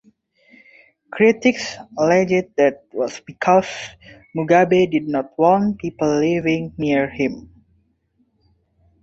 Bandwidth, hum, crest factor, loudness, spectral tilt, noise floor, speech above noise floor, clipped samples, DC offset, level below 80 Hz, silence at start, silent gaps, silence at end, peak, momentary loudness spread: 8 kHz; none; 18 dB; -18 LUFS; -6 dB/octave; -64 dBFS; 46 dB; under 0.1%; under 0.1%; -54 dBFS; 1.1 s; none; 1.65 s; -2 dBFS; 13 LU